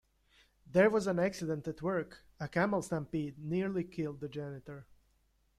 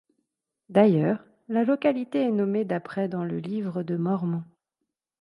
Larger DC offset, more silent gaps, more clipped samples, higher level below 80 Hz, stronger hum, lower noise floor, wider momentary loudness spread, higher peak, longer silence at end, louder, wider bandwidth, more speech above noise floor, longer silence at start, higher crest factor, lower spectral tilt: neither; neither; neither; first, -64 dBFS vs -72 dBFS; neither; second, -73 dBFS vs -83 dBFS; first, 16 LU vs 10 LU; second, -14 dBFS vs -6 dBFS; about the same, 0.75 s vs 0.75 s; second, -34 LUFS vs -26 LUFS; first, 13.5 kHz vs 10.5 kHz; second, 39 dB vs 59 dB; about the same, 0.7 s vs 0.7 s; about the same, 22 dB vs 20 dB; second, -6.5 dB/octave vs -9.5 dB/octave